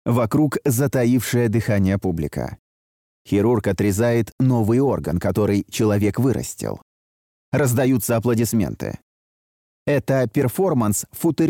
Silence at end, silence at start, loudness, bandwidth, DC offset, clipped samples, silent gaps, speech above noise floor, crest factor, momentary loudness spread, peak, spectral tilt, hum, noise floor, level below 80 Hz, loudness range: 0 s; 0.05 s; -20 LUFS; 17 kHz; under 0.1%; under 0.1%; 2.59-3.25 s, 4.32-4.38 s, 6.82-7.52 s, 9.02-9.86 s; over 71 dB; 12 dB; 9 LU; -8 dBFS; -6.5 dB/octave; none; under -90 dBFS; -46 dBFS; 3 LU